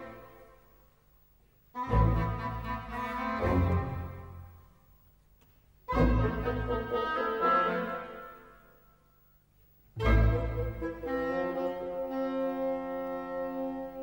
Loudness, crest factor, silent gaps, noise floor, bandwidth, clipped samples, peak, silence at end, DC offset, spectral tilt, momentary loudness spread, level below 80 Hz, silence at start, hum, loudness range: -31 LUFS; 20 dB; none; -64 dBFS; 16 kHz; under 0.1%; -14 dBFS; 0 s; under 0.1%; -8.5 dB/octave; 19 LU; -38 dBFS; 0 s; 50 Hz at -65 dBFS; 4 LU